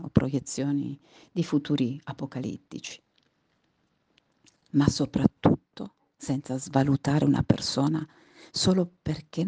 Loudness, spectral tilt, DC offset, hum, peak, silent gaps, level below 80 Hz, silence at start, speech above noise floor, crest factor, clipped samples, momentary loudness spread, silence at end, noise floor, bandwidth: -27 LUFS; -6 dB/octave; under 0.1%; none; -4 dBFS; none; -54 dBFS; 0 s; 45 dB; 24 dB; under 0.1%; 16 LU; 0 s; -72 dBFS; 9.8 kHz